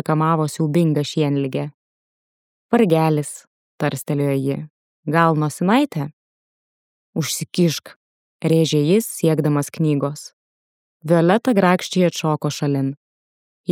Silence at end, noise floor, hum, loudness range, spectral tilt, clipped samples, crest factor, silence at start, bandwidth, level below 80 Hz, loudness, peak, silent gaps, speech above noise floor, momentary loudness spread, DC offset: 0 s; under -90 dBFS; none; 3 LU; -6 dB/octave; under 0.1%; 18 dB; 0.1 s; 16.5 kHz; -70 dBFS; -19 LUFS; -2 dBFS; 1.74-2.69 s, 3.47-3.78 s, 4.70-5.03 s, 6.13-7.13 s, 7.96-8.39 s, 10.33-11.00 s, 12.97-13.64 s; over 72 dB; 14 LU; under 0.1%